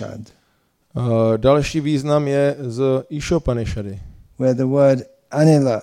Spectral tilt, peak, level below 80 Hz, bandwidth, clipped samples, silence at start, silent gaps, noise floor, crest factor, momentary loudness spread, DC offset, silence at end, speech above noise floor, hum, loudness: -7 dB/octave; -4 dBFS; -40 dBFS; 12 kHz; under 0.1%; 0 s; none; -63 dBFS; 14 dB; 14 LU; under 0.1%; 0 s; 45 dB; none; -18 LUFS